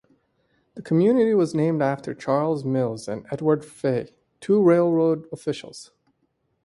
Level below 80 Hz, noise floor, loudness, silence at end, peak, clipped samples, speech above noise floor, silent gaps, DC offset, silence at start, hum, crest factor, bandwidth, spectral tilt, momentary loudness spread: -64 dBFS; -71 dBFS; -22 LUFS; 0.8 s; -6 dBFS; under 0.1%; 49 dB; none; under 0.1%; 0.75 s; none; 16 dB; 11.5 kHz; -7.5 dB/octave; 15 LU